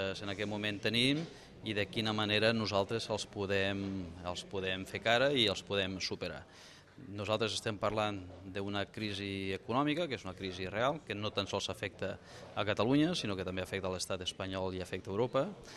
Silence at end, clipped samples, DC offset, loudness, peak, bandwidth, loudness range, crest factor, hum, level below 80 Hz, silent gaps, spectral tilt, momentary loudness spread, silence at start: 0 s; under 0.1%; under 0.1%; -35 LUFS; -14 dBFS; 13 kHz; 4 LU; 22 dB; none; -66 dBFS; none; -4.5 dB/octave; 12 LU; 0 s